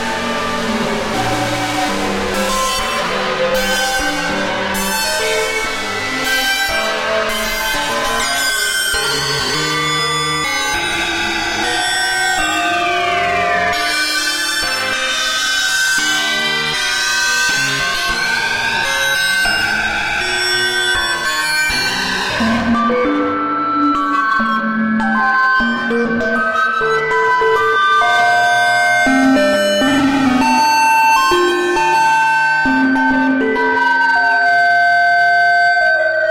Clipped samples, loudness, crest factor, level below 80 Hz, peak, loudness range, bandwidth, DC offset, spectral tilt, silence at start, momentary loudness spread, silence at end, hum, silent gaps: under 0.1%; -14 LUFS; 10 dB; -40 dBFS; -4 dBFS; 4 LU; 16.5 kHz; under 0.1%; -2 dB/octave; 0 s; 6 LU; 0 s; none; none